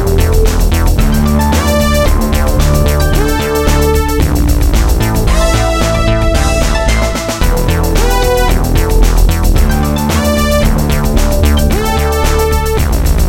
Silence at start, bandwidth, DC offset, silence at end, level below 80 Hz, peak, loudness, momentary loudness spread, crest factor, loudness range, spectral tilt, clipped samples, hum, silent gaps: 0 s; 17 kHz; 0.7%; 0 s; -12 dBFS; 0 dBFS; -12 LUFS; 2 LU; 10 dB; 1 LU; -5.5 dB/octave; under 0.1%; none; none